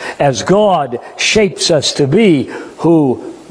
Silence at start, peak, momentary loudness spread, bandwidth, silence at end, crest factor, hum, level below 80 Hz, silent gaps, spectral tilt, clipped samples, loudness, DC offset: 0 s; 0 dBFS; 7 LU; 10.5 kHz; 0.05 s; 12 dB; none; -46 dBFS; none; -4.5 dB/octave; under 0.1%; -12 LUFS; under 0.1%